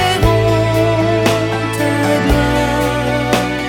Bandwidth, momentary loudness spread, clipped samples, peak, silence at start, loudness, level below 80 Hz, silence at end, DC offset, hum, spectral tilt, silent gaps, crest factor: 17.5 kHz; 4 LU; under 0.1%; 0 dBFS; 0 s; -14 LUFS; -26 dBFS; 0 s; under 0.1%; none; -5.5 dB/octave; none; 14 dB